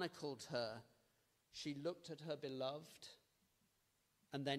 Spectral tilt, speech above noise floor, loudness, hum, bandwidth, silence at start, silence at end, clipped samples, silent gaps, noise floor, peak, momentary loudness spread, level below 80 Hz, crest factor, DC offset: -4.5 dB/octave; 35 dB; -49 LUFS; none; 15.5 kHz; 0 s; 0 s; under 0.1%; none; -82 dBFS; -28 dBFS; 13 LU; -86 dBFS; 22 dB; under 0.1%